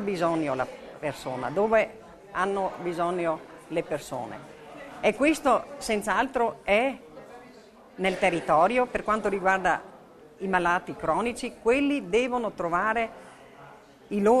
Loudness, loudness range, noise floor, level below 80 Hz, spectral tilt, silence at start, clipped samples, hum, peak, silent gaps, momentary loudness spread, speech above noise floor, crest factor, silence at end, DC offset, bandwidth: -27 LUFS; 3 LU; -51 dBFS; -56 dBFS; -5 dB/octave; 0 s; under 0.1%; none; -8 dBFS; none; 12 LU; 25 dB; 18 dB; 0 s; under 0.1%; 13.5 kHz